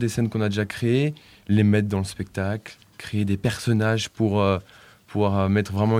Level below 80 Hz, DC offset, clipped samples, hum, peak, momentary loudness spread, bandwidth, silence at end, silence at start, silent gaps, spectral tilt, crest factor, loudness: -54 dBFS; under 0.1%; under 0.1%; none; -6 dBFS; 10 LU; 15 kHz; 0 s; 0 s; none; -6.5 dB/octave; 16 dB; -24 LUFS